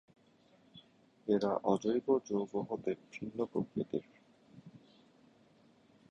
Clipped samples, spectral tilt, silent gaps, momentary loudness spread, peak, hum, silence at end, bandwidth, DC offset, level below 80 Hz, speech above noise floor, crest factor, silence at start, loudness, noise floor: under 0.1%; -7 dB/octave; none; 11 LU; -16 dBFS; none; 1.35 s; 9 kHz; under 0.1%; -74 dBFS; 32 dB; 22 dB; 0.75 s; -36 LUFS; -67 dBFS